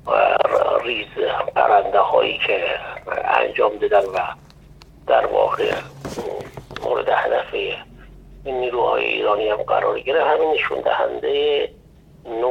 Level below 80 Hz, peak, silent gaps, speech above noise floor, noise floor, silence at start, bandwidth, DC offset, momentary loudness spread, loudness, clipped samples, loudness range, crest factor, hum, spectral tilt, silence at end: -50 dBFS; -2 dBFS; none; 26 dB; -45 dBFS; 0.05 s; 12 kHz; under 0.1%; 13 LU; -20 LUFS; under 0.1%; 4 LU; 18 dB; none; -4.5 dB/octave; 0 s